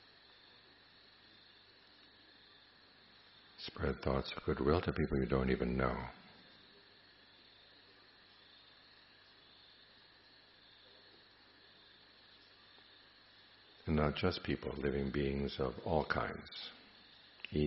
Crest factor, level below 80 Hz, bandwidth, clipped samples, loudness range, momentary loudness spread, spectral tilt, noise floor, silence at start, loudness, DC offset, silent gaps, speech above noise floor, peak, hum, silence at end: 24 dB; -54 dBFS; 5.8 kHz; under 0.1%; 23 LU; 26 LU; -5 dB/octave; -64 dBFS; 3.6 s; -38 LUFS; under 0.1%; none; 27 dB; -16 dBFS; none; 0 s